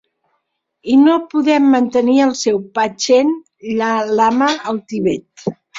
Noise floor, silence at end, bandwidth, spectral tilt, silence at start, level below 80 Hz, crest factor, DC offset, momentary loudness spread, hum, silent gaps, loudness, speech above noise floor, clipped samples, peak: -70 dBFS; 0 s; 7.8 kHz; -4.5 dB/octave; 0.85 s; -58 dBFS; 14 dB; under 0.1%; 11 LU; none; none; -15 LUFS; 56 dB; under 0.1%; -2 dBFS